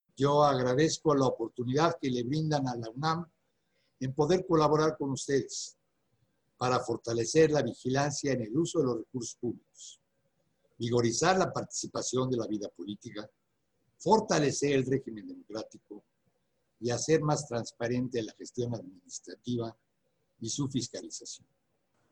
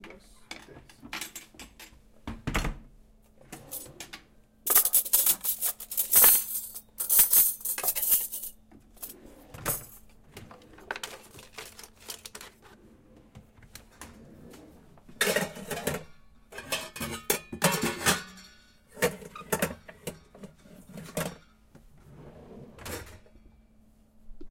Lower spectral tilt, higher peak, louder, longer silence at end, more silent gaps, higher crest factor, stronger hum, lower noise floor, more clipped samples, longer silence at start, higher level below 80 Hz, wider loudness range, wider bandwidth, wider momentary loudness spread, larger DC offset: first, -5 dB/octave vs -1.5 dB/octave; second, -10 dBFS vs -4 dBFS; second, -30 LUFS vs -25 LUFS; first, 0.75 s vs 0 s; neither; second, 22 dB vs 28 dB; neither; first, -78 dBFS vs -59 dBFS; neither; first, 0.2 s vs 0.05 s; second, -64 dBFS vs -52 dBFS; second, 5 LU vs 22 LU; second, 11 kHz vs 17 kHz; second, 16 LU vs 27 LU; neither